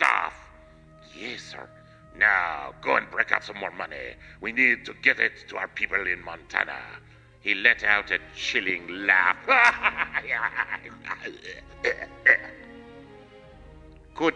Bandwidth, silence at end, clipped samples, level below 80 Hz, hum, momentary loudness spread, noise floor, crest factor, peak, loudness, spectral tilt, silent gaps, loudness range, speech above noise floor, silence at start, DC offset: 10.5 kHz; 0 s; under 0.1%; -56 dBFS; none; 18 LU; -51 dBFS; 26 dB; -2 dBFS; -24 LUFS; -3 dB/octave; none; 5 LU; 25 dB; 0 s; under 0.1%